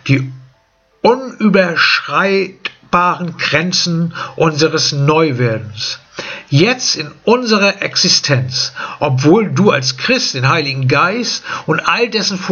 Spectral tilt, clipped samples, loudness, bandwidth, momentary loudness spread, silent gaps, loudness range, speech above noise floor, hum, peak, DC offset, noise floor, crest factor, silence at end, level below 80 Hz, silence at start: -4 dB/octave; under 0.1%; -13 LUFS; 7.4 kHz; 9 LU; none; 2 LU; 42 dB; none; 0 dBFS; under 0.1%; -55 dBFS; 14 dB; 0 s; -54 dBFS; 0.05 s